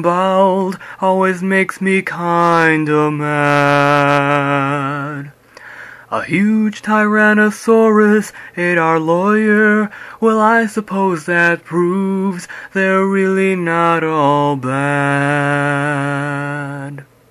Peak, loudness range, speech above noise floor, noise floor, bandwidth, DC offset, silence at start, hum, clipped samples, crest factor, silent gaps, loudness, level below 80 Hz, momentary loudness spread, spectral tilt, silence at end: 0 dBFS; 3 LU; 22 dB; -36 dBFS; 13.5 kHz; under 0.1%; 0 s; none; under 0.1%; 14 dB; none; -14 LUFS; -60 dBFS; 11 LU; -6.5 dB/octave; 0.25 s